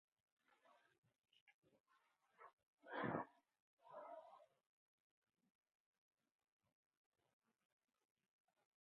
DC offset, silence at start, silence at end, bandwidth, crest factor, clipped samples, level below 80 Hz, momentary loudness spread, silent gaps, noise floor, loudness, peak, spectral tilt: under 0.1%; 0.65 s; 4.35 s; 4.2 kHz; 30 dB; under 0.1%; under -90 dBFS; 21 LU; 0.98-1.02 s, 1.41-1.47 s, 1.54-1.62 s, 1.80-1.84 s, 2.53-2.57 s, 2.66-2.77 s, 3.60-3.77 s; -83 dBFS; -52 LUFS; -30 dBFS; -5 dB/octave